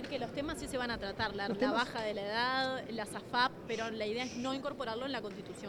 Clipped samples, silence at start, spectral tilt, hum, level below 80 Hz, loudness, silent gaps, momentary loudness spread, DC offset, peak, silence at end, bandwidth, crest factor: under 0.1%; 0 s; -4 dB/octave; none; -60 dBFS; -36 LUFS; none; 7 LU; under 0.1%; -18 dBFS; 0 s; 19 kHz; 20 dB